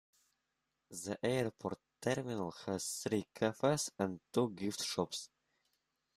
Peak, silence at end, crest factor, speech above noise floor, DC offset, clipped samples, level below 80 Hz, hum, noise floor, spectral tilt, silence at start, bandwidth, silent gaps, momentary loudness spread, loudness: -18 dBFS; 0.9 s; 22 dB; 48 dB; under 0.1%; under 0.1%; -76 dBFS; none; -86 dBFS; -4.5 dB/octave; 0.9 s; 15.5 kHz; none; 10 LU; -38 LUFS